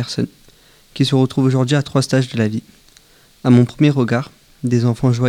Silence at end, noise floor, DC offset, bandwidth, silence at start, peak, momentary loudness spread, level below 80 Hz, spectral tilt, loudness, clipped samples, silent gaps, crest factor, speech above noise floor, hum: 0 s; -49 dBFS; under 0.1%; 12 kHz; 0 s; 0 dBFS; 13 LU; -50 dBFS; -7 dB/octave; -17 LUFS; under 0.1%; none; 16 dB; 34 dB; none